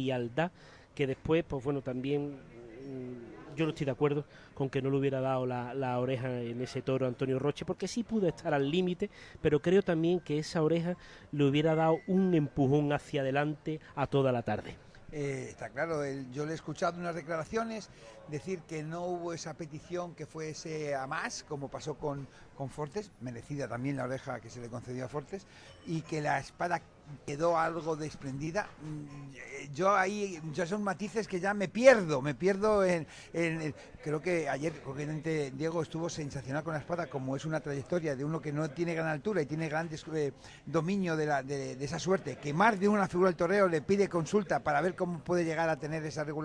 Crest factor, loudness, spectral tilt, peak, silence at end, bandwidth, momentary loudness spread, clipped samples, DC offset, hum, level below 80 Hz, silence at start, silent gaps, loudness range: 26 dB; -33 LUFS; -6 dB/octave; -8 dBFS; 0 s; 10.5 kHz; 14 LU; under 0.1%; under 0.1%; none; -60 dBFS; 0 s; none; 9 LU